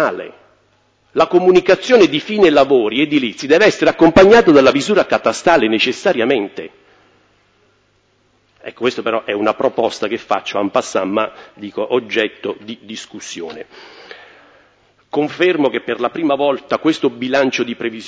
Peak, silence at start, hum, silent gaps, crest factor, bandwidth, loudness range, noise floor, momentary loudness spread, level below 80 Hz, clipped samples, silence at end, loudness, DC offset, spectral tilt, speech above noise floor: 0 dBFS; 0 s; none; none; 16 dB; 8 kHz; 12 LU; -58 dBFS; 18 LU; -48 dBFS; under 0.1%; 0 s; -14 LUFS; under 0.1%; -4.5 dB/octave; 44 dB